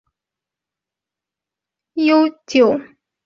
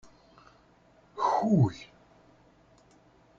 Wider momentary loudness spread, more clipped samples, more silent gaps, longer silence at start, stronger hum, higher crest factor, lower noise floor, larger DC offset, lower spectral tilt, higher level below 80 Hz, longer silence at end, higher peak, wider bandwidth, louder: second, 10 LU vs 23 LU; neither; neither; first, 1.95 s vs 1.15 s; neither; about the same, 18 dB vs 20 dB; first, -87 dBFS vs -61 dBFS; neither; second, -5 dB/octave vs -8.5 dB/octave; about the same, -66 dBFS vs -64 dBFS; second, 0.4 s vs 1.55 s; first, -2 dBFS vs -14 dBFS; about the same, 7.4 kHz vs 7.6 kHz; first, -16 LUFS vs -27 LUFS